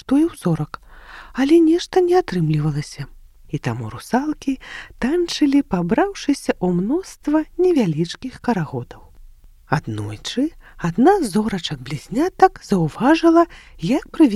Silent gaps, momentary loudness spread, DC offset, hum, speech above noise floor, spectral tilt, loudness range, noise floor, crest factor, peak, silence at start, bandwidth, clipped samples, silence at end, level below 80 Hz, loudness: none; 14 LU; under 0.1%; none; 25 dB; -6.5 dB/octave; 5 LU; -44 dBFS; 20 dB; 0 dBFS; 0.1 s; 13 kHz; under 0.1%; 0 s; -44 dBFS; -19 LUFS